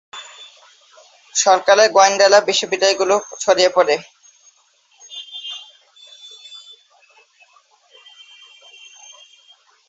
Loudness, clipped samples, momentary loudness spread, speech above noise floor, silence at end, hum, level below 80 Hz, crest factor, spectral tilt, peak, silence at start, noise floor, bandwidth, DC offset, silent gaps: -15 LUFS; under 0.1%; 25 LU; 43 dB; 3.3 s; none; -68 dBFS; 20 dB; -0.5 dB/octave; 0 dBFS; 0.15 s; -57 dBFS; 8 kHz; under 0.1%; none